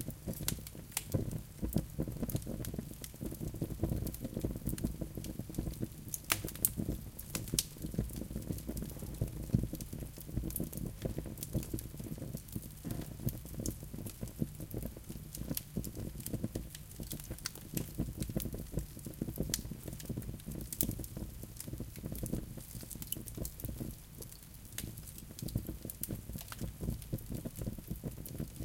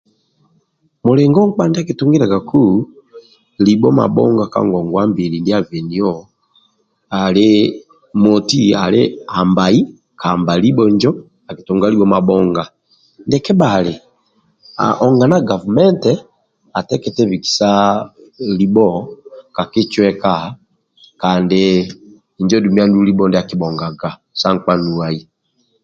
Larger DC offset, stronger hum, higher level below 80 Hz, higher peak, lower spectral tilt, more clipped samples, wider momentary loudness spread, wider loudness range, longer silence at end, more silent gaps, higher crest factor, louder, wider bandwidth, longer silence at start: neither; neither; about the same, -48 dBFS vs -48 dBFS; second, -4 dBFS vs 0 dBFS; second, -5 dB/octave vs -6.5 dB/octave; neither; about the same, 10 LU vs 12 LU; first, 6 LU vs 3 LU; second, 0 s vs 0.6 s; neither; first, 36 dB vs 14 dB; second, -41 LUFS vs -14 LUFS; first, 17 kHz vs 7.6 kHz; second, 0 s vs 1.05 s